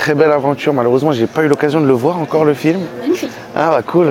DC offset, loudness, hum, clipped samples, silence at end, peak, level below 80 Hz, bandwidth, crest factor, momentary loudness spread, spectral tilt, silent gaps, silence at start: under 0.1%; -14 LUFS; none; under 0.1%; 0 s; 0 dBFS; -56 dBFS; 16.5 kHz; 12 dB; 6 LU; -7 dB/octave; none; 0 s